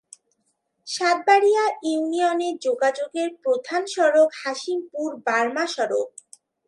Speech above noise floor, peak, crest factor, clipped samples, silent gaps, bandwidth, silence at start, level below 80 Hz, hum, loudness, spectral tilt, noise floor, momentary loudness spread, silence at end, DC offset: 51 dB; -6 dBFS; 18 dB; under 0.1%; none; 11.5 kHz; 0.85 s; -82 dBFS; none; -22 LUFS; -2 dB/octave; -72 dBFS; 10 LU; 0.6 s; under 0.1%